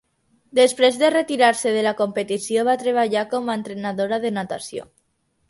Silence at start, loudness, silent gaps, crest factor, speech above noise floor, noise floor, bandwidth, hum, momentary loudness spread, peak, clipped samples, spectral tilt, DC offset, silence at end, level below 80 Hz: 0.55 s; -20 LUFS; none; 18 dB; 48 dB; -68 dBFS; 11.5 kHz; none; 11 LU; -2 dBFS; under 0.1%; -3.5 dB/octave; under 0.1%; 0.65 s; -68 dBFS